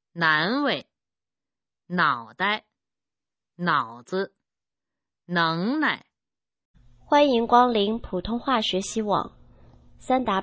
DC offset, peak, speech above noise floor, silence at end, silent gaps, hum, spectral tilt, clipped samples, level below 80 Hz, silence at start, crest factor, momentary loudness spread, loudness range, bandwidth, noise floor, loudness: under 0.1%; -4 dBFS; over 67 dB; 0 s; 6.65-6.74 s; none; -4.5 dB/octave; under 0.1%; -54 dBFS; 0.15 s; 22 dB; 11 LU; 6 LU; 8 kHz; under -90 dBFS; -24 LUFS